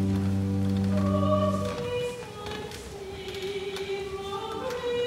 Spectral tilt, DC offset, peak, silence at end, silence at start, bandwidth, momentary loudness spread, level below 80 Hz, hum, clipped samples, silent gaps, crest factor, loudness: -6.5 dB/octave; under 0.1%; -12 dBFS; 0 s; 0 s; 15 kHz; 12 LU; -50 dBFS; none; under 0.1%; none; 16 dB; -30 LUFS